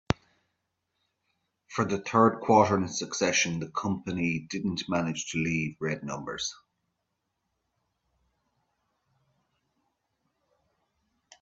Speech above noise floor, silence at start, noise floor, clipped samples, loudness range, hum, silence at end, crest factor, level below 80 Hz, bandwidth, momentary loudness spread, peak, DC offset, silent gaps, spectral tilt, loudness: 53 dB; 0.1 s; -81 dBFS; under 0.1%; 13 LU; none; 4.85 s; 30 dB; -60 dBFS; 8 kHz; 11 LU; -2 dBFS; under 0.1%; none; -4.5 dB/octave; -28 LUFS